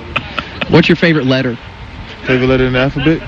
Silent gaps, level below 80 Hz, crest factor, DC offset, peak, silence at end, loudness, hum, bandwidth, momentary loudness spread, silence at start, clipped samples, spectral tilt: none; -32 dBFS; 14 dB; under 0.1%; 0 dBFS; 0 s; -13 LUFS; none; 7.4 kHz; 18 LU; 0 s; under 0.1%; -7 dB/octave